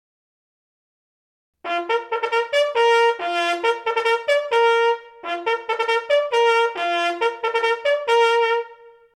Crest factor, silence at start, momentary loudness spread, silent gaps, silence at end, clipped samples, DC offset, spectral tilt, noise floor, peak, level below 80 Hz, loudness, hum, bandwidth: 14 dB; 1.65 s; 8 LU; none; 0.3 s; under 0.1%; under 0.1%; -0.5 dB/octave; -45 dBFS; -6 dBFS; -74 dBFS; -20 LUFS; none; 11.5 kHz